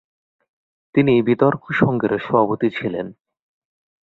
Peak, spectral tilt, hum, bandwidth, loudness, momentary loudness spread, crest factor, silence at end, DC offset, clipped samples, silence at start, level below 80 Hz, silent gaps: -2 dBFS; -9.5 dB/octave; none; 4.6 kHz; -19 LUFS; 10 LU; 18 dB; 0.95 s; under 0.1%; under 0.1%; 0.95 s; -56 dBFS; none